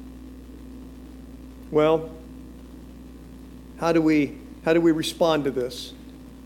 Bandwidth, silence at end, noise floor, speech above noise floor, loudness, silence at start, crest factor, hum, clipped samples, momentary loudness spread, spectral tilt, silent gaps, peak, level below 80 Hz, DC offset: 16.5 kHz; 0.05 s; -42 dBFS; 21 dB; -23 LUFS; 0 s; 18 dB; none; under 0.1%; 24 LU; -5.5 dB/octave; none; -8 dBFS; -46 dBFS; under 0.1%